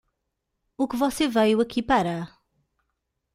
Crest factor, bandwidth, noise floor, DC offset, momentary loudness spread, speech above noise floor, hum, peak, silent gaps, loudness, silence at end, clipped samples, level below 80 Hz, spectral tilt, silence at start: 18 dB; 16 kHz; -80 dBFS; under 0.1%; 10 LU; 57 dB; none; -8 dBFS; none; -24 LUFS; 1.1 s; under 0.1%; -54 dBFS; -5 dB/octave; 0.8 s